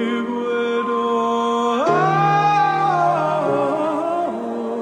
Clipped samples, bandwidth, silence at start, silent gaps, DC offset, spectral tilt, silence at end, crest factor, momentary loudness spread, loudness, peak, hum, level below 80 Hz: under 0.1%; 10 kHz; 0 s; none; under 0.1%; -6 dB/octave; 0 s; 12 dB; 7 LU; -19 LUFS; -6 dBFS; none; -66 dBFS